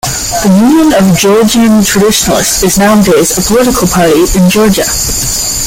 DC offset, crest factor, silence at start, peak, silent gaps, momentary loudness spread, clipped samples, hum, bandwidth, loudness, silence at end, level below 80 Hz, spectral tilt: under 0.1%; 6 dB; 0.05 s; 0 dBFS; none; 4 LU; under 0.1%; none; 17 kHz; -7 LUFS; 0 s; -26 dBFS; -4 dB/octave